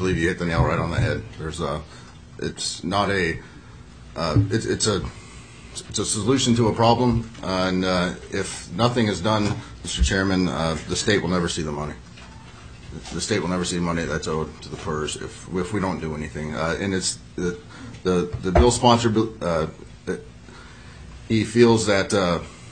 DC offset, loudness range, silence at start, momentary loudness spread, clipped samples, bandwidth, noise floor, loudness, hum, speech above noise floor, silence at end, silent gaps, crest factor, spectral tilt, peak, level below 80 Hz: 0.1%; 5 LU; 0 s; 21 LU; under 0.1%; 9.6 kHz; -43 dBFS; -23 LUFS; none; 21 dB; 0 s; none; 22 dB; -5 dB/octave; -2 dBFS; -36 dBFS